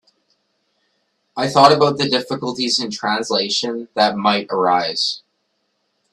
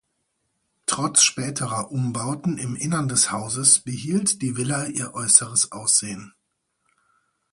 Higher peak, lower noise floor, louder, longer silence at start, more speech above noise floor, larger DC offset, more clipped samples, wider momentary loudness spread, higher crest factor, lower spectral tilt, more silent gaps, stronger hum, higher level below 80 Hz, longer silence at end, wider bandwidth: about the same, 0 dBFS vs 0 dBFS; second, -69 dBFS vs -74 dBFS; first, -17 LUFS vs -20 LUFS; first, 1.35 s vs 0.9 s; about the same, 52 dB vs 52 dB; neither; neither; about the same, 12 LU vs 11 LU; about the same, 20 dB vs 24 dB; about the same, -3.5 dB/octave vs -2.5 dB/octave; neither; neither; about the same, -62 dBFS vs -62 dBFS; second, 0.95 s vs 1.25 s; about the same, 12.5 kHz vs 11.5 kHz